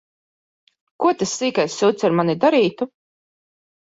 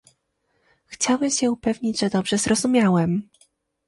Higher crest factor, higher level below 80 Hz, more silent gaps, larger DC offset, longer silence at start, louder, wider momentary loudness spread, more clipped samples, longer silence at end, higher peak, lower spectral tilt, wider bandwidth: about the same, 18 dB vs 16 dB; second, -64 dBFS vs -56 dBFS; neither; neither; about the same, 1 s vs 0.9 s; about the same, -19 LUFS vs -21 LUFS; about the same, 5 LU vs 6 LU; neither; first, 0.95 s vs 0.65 s; about the same, -4 dBFS vs -6 dBFS; about the same, -5 dB/octave vs -4.5 dB/octave; second, 8 kHz vs 11.5 kHz